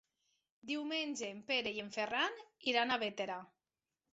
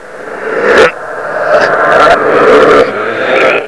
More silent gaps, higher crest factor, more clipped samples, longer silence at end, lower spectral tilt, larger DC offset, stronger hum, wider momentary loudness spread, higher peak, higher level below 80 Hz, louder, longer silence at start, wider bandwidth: neither; first, 22 dB vs 8 dB; second, under 0.1% vs 3%; first, 0.65 s vs 0 s; second, 0 dB/octave vs -4 dB/octave; second, under 0.1% vs 1%; neither; second, 9 LU vs 12 LU; second, -18 dBFS vs 0 dBFS; second, -80 dBFS vs -40 dBFS; second, -38 LUFS vs -7 LUFS; first, 0.65 s vs 0 s; second, 8 kHz vs 11 kHz